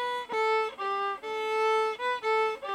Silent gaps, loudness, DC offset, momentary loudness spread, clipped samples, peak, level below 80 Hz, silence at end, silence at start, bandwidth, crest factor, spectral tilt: none; -29 LUFS; under 0.1%; 5 LU; under 0.1%; -18 dBFS; -74 dBFS; 0 s; 0 s; 12.5 kHz; 10 dB; -1.5 dB/octave